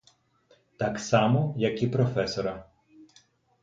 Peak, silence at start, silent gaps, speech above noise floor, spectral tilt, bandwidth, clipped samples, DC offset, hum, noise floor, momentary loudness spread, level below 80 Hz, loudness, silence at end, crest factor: -8 dBFS; 0.8 s; none; 38 dB; -6.5 dB/octave; 7.8 kHz; under 0.1%; under 0.1%; none; -64 dBFS; 9 LU; -58 dBFS; -27 LUFS; 0.6 s; 20 dB